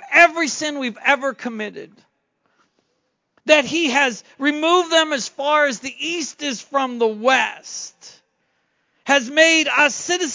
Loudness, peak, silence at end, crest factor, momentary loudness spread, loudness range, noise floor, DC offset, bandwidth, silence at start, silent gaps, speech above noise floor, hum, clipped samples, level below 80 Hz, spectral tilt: -18 LUFS; 0 dBFS; 0 s; 20 dB; 16 LU; 4 LU; -71 dBFS; under 0.1%; 7.8 kHz; 0 s; none; 51 dB; none; under 0.1%; -70 dBFS; -1.5 dB/octave